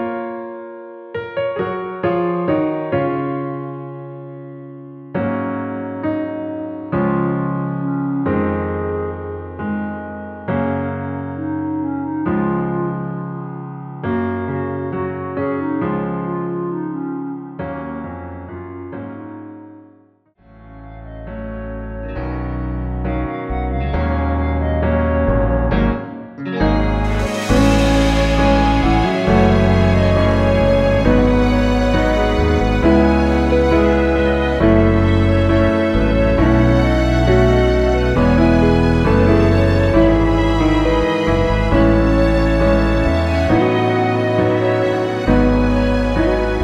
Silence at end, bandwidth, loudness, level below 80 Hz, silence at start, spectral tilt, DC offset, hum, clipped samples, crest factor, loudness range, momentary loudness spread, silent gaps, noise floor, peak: 0 s; 11 kHz; -17 LUFS; -24 dBFS; 0 s; -7.5 dB/octave; under 0.1%; none; under 0.1%; 16 dB; 12 LU; 15 LU; none; -53 dBFS; 0 dBFS